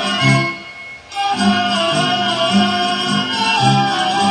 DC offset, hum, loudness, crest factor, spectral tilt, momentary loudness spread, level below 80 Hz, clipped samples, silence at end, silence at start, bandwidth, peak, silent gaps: under 0.1%; none; -15 LUFS; 16 dB; -4 dB/octave; 9 LU; -54 dBFS; under 0.1%; 0 s; 0 s; 10.5 kHz; 0 dBFS; none